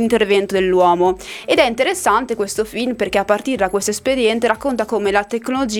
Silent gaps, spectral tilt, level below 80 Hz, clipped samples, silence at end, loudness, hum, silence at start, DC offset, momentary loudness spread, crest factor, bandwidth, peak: none; -3.5 dB/octave; -46 dBFS; under 0.1%; 0 s; -17 LUFS; none; 0 s; under 0.1%; 6 LU; 16 dB; 17.5 kHz; 0 dBFS